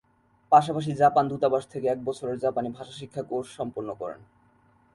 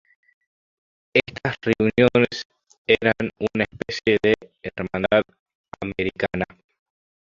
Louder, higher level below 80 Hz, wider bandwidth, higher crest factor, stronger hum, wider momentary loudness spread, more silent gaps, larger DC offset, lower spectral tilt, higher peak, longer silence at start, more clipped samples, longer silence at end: second, -26 LUFS vs -22 LUFS; second, -66 dBFS vs -50 dBFS; first, 11.5 kHz vs 7.4 kHz; about the same, 22 dB vs 22 dB; neither; about the same, 16 LU vs 15 LU; second, none vs 2.45-2.50 s, 2.78-2.85 s, 5.39-5.46 s, 5.55-5.64 s; neither; about the same, -6.5 dB/octave vs -6 dB/octave; about the same, -4 dBFS vs -2 dBFS; second, 0.5 s vs 1.15 s; neither; second, 0.7 s vs 0.95 s